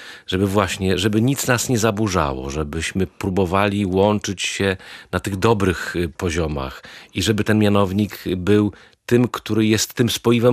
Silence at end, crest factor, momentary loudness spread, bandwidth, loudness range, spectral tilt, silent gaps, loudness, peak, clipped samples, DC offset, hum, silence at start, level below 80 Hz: 0 s; 18 dB; 8 LU; 15 kHz; 2 LU; -5 dB/octave; none; -20 LUFS; -2 dBFS; under 0.1%; under 0.1%; none; 0 s; -40 dBFS